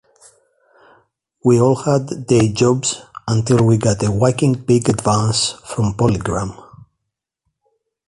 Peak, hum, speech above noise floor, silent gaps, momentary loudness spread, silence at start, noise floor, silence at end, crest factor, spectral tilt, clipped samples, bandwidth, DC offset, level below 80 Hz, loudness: -2 dBFS; none; 63 dB; none; 7 LU; 1.45 s; -78 dBFS; 1.55 s; 16 dB; -6 dB/octave; under 0.1%; 11.5 kHz; under 0.1%; -42 dBFS; -17 LUFS